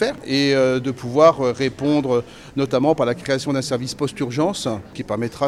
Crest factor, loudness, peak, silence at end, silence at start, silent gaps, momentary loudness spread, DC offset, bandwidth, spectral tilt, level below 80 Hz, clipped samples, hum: 18 dB; -20 LUFS; -2 dBFS; 0 s; 0 s; none; 11 LU; under 0.1%; 13.5 kHz; -5.5 dB/octave; -52 dBFS; under 0.1%; none